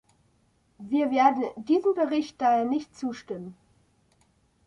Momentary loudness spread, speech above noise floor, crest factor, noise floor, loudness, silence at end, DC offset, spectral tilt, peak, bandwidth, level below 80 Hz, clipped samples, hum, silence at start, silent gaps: 16 LU; 41 dB; 20 dB; -67 dBFS; -26 LUFS; 1.15 s; under 0.1%; -6 dB/octave; -8 dBFS; 10.5 kHz; -70 dBFS; under 0.1%; none; 0.8 s; none